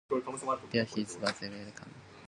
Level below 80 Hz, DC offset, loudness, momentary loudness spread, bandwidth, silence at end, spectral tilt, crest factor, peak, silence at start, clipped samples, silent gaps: -70 dBFS; under 0.1%; -35 LUFS; 15 LU; 11.5 kHz; 0 s; -4.5 dB/octave; 22 dB; -16 dBFS; 0.1 s; under 0.1%; none